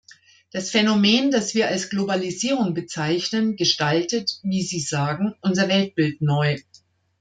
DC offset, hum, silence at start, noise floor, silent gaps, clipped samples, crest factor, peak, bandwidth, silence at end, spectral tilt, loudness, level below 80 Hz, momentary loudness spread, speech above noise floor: under 0.1%; none; 0.55 s; -56 dBFS; none; under 0.1%; 16 dB; -6 dBFS; 9.4 kHz; 0.6 s; -4.5 dB/octave; -22 LUFS; -64 dBFS; 7 LU; 35 dB